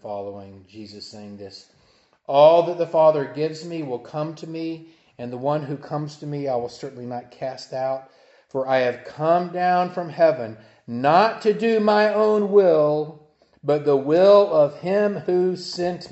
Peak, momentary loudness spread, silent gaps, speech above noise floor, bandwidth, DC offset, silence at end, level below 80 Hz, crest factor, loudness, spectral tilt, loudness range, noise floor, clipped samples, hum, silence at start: -2 dBFS; 19 LU; none; 39 dB; 8.2 kHz; under 0.1%; 0.05 s; -70 dBFS; 20 dB; -20 LUFS; -6.5 dB/octave; 10 LU; -60 dBFS; under 0.1%; none; 0.05 s